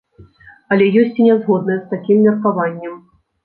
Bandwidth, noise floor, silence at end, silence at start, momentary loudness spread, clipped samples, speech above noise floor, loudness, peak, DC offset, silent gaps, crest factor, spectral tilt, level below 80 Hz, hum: 4.4 kHz; -44 dBFS; 0.5 s; 0.2 s; 9 LU; under 0.1%; 30 dB; -15 LUFS; -2 dBFS; under 0.1%; none; 14 dB; -11 dB/octave; -60 dBFS; none